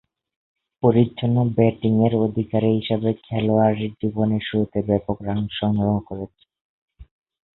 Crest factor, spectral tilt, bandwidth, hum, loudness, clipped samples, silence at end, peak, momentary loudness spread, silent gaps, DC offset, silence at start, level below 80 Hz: 20 dB; -12.5 dB/octave; 4.1 kHz; none; -21 LUFS; under 0.1%; 0.55 s; -2 dBFS; 7 LU; 6.61-6.88 s; under 0.1%; 0.85 s; -48 dBFS